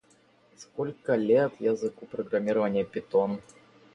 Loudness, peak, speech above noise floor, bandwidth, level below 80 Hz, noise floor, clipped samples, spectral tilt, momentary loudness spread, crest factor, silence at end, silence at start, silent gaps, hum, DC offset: -28 LUFS; -12 dBFS; 35 dB; 9.6 kHz; -70 dBFS; -62 dBFS; under 0.1%; -7 dB/octave; 11 LU; 18 dB; 0.55 s; 0.6 s; none; none; under 0.1%